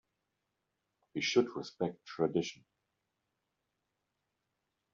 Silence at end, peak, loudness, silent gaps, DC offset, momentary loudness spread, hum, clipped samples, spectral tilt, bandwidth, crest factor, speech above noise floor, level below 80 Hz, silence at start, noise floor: 2.4 s; -16 dBFS; -35 LUFS; none; under 0.1%; 10 LU; none; under 0.1%; -4 dB/octave; 7.4 kHz; 24 dB; 51 dB; -80 dBFS; 1.15 s; -85 dBFS